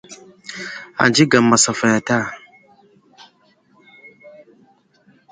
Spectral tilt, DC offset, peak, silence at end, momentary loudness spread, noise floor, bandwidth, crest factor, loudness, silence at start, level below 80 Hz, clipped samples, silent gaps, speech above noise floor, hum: -3.5 dB/octave; under 0.1%; 0 dBFS; 1 s; 21 LU; -57 dBFS; 9.6 kHz; 20 dB; -16 LUFS; 0.1 s; -60 dBFS; under 0.1%; none; 41 dB; none